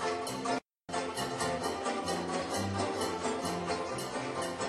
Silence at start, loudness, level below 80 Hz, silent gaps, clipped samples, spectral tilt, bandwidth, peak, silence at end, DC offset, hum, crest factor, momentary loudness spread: 0 s; -35 LUFS; -62 dBFS; none; under 0.1%; -4 dB/octave; 13 kHz; -20 dBFS; 0 s; under 0.1%; none; 16 dB; 3 LU